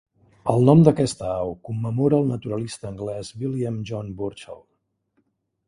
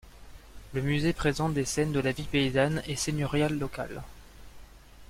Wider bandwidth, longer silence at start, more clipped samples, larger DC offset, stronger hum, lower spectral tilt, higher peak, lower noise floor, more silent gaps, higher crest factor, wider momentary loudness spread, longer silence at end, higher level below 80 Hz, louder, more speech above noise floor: second, 11 kHz vs 16 kHz; first, 0.45 s vs 0.05 s; neither; neither; neither; first, -8 dB/octave vs -5 dB/octave; first, -2 dBFS vs -12 dBFS; first, -70 dBFS vs -50 dBFS; neither; about the same, 22 dB vs 18 dB; first, 16 LU vs 11 LU; first, 1.15 s vs 0.05 s; second, -52 dBFS vs -46 dBFS; first, -22 LUFS vs -29 LUFS; first, 49 dB vs 21 dB